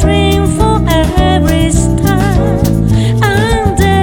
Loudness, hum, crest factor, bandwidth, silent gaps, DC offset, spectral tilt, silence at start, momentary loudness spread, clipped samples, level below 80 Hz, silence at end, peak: -11 LUFS; none; 10 dB; 19.5 kHz; none; under 0.1%; -6 dB/octave; 0 s; 1 LU; under 0.1%; -16 dBFS; 0 s; 0 dBFS